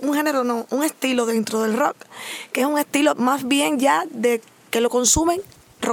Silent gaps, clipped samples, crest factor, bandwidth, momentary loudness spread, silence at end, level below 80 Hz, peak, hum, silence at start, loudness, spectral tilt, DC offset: none; under 0.1%; 16 dB; 19.5 kHz; 9 LU; 0 s; -48 dBFS; -4 dBFS; none; 0 s; -20 LUFS; -2.5 dB/octave; under 0.1%